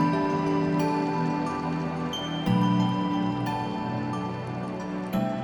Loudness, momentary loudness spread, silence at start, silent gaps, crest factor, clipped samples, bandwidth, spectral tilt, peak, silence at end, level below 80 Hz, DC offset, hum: -27 LUFS; 8 LU; 0 s; none; 14 dB; under 0.1%; 20 kHz; -7 dB/octave; -12 dBFS; 0 s; -56 dBFS; under 0.1%; none